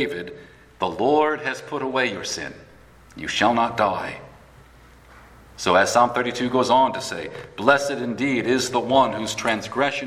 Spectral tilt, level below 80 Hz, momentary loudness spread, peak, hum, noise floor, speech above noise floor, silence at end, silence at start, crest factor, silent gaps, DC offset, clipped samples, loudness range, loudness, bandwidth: -3.5 dB/octave; -56 dBFS; 12 LU; 0 dBFS; none; -49 dBFS; 27 dB; 0 s; 0 s; 22 dB; none; under 0.1%; under 0.1%; 5 LU; -21 LUFS; 15.5 kHz